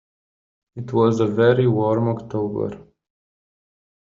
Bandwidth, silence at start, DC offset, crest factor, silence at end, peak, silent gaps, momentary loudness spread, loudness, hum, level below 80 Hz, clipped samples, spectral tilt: 7.4 kHz; 0.75 s; under 0.1%; 18 dB; 1.25 s; -4 dBFS; none; 13 LU; -20 LUFS; none; -58 dBFS; under 0.1%; -7.5 dB/octave